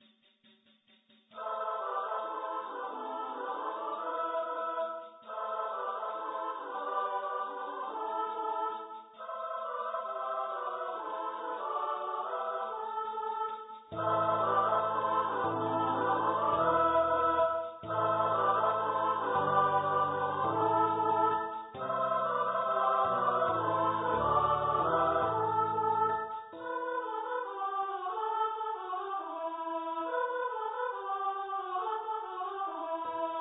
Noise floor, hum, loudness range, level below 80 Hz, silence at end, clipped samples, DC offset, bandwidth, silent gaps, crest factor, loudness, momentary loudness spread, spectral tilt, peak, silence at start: -67 dBFS; none; 7 LU; -66 dBFS; 0 s; under 0.1%; under 0.1%; 4 kHz; none; 18 dB; -32 LUFS; 10 LU; -9 dB/octave; -14 dBFS; 1.35 s